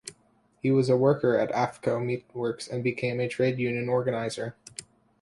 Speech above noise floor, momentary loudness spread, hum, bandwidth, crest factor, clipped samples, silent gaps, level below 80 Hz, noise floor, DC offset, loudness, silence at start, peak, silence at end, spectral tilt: 39 dB; 14 LU; none; 11.5 kHz; 18 dB; under 0.1%; none; -66 dBFS; -65 dBFS; under 0.1%; -27 LUFS; 0.05 s; -10 dBFS; 0.4 s; -6.5 dB/octave